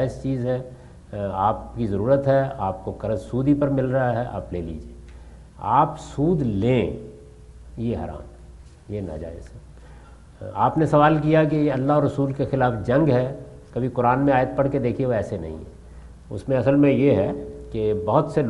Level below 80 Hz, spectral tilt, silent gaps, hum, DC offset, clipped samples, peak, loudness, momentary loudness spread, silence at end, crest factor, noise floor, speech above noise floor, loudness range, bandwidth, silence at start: -44 dBFS; -8.5 dB/octave; none; none; under 0.1%; under 0.1%; -4 dBFS; -22 LUFS; 17 LU; 0 s; 20 dB; -45 dBFS; 23 dB; 7 LU; 11 kHz; 0 s